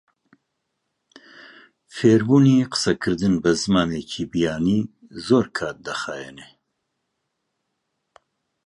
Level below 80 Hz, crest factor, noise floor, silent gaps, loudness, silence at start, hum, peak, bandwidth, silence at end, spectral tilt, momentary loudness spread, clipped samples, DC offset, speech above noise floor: -52 dBFS; 20 dB; -77 dBFS; none; -20 LUFS; 1.95 s; none; -4 dBFS; 11.5 kHz; 2.2 s; -6 dB/octave; 17 LU; under 0.1%; under 0.1%; 57 dB